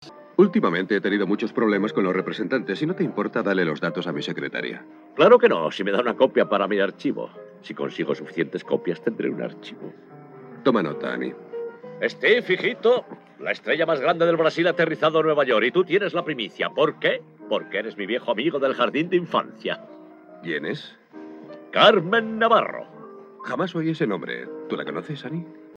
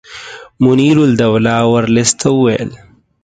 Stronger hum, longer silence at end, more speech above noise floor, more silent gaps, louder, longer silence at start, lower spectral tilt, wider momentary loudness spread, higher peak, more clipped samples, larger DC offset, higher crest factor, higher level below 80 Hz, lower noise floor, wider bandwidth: neither; second, 0.05 s vs 0.45 s; about the same, 20 dB vs 21 dB; neither; second, -23 LUFS vs -11 LUFS; about the same, 0 s vs 0.1 s; first, -6.5 dB/octave vs -5 dB/octave; about the same, 15 LU vs 17 LU; about the same, -2 dBFS vs 0 dBFS; neither; neither; first, 20 dB vs 12 dB; second, -82 dBFS vs -46 dBFS; first, -42 dBFS vs -32 dBFS; second, 7.4 kHz vs 9.6 kHz